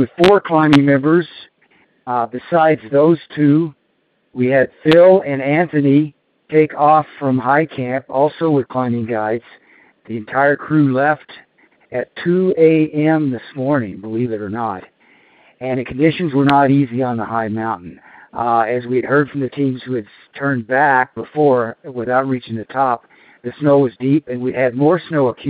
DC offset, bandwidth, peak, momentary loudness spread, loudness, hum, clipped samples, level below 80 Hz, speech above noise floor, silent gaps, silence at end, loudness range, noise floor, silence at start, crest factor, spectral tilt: under 0.1%; 8.8 kHz; 0 dBFS; 12 LU; -16 LUFS; none; under 0.1%; -56 dBFS; 48 dB; none; 0 s; 5 LU; -63 dBFS; 0 s; 16 dB; -8.5 dB/octave